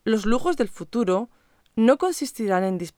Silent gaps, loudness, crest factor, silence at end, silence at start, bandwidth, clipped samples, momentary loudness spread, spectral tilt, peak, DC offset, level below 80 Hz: none; -23 LUFS; 18 dB; 0.1 s; 0.05 s; 18 kHz; under 0.1%; 8 LU; -5.5 dB/octave; -4 dBFS; under 0.1%; -44 dBFS